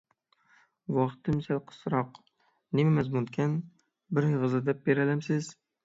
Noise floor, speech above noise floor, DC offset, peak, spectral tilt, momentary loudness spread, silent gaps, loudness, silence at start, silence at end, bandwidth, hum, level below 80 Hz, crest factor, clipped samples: -68 dBFS; 39 dB; under 0.1%; -12 dBFS; -8 dB/octave; 9 LU; none; -29 LUFS; 0.9 s; 0.35 s; 8 kHz; none; -64 dBFS; 18 dB; under 0.1%